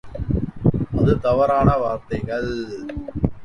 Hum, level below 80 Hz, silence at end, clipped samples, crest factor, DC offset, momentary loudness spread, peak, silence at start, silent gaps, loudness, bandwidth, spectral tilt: none; -32 dBFS; 0 s; under 0.1%; 18 dB; under 0.1%; 12 LU; -2 dBFS; 0.05 s; none; -21 LUFS; 10 kHz; -9 dB/octave